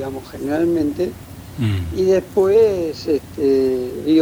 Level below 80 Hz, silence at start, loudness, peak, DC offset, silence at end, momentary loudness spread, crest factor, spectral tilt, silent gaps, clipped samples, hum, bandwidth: -42 dBFS; 0 s; -19 LUFS; -4 dBFS; under 0.1%; 0 s; 11 LU; 14 dB; -7.5 dB/octave; none; under 0.1%; none; over 20 kHz